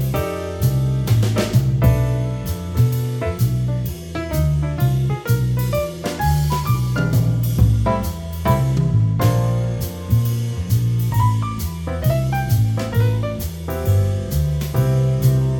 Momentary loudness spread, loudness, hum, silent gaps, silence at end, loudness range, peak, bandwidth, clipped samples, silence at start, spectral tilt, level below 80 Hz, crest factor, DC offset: 7 LU; -19 LUFS; none; none; 0 s; 2 LU; -2 dBFS; 18 kHz; under 0.1%; 0 s; -7 dB/octave; -30 dBFS; 16 dB; under 0.1%